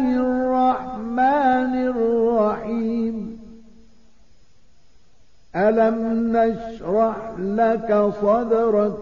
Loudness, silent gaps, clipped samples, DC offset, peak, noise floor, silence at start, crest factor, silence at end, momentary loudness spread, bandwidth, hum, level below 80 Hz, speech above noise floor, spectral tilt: -20 LUFS; none; under 0.1%; 0.5%; -8 dBFS; -58 dBFS; 0 s; 14 dB; 0 s; 9 LU; 7.2 kHz; none; -50 dBFS; 39 dB; -8.5 dB/octave